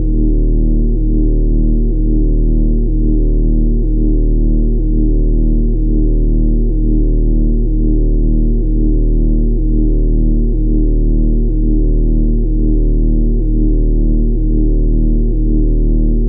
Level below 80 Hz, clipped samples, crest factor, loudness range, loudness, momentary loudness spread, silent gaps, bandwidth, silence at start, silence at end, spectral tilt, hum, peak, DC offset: -12 dBFS; under 0.1%; 6 dB; 0 LU; -15 LUFS; 1 LU; none; 0.8 kHz; 0 s; 0 s; -19 dB/octave; none; -4 dBFS; under 0.1%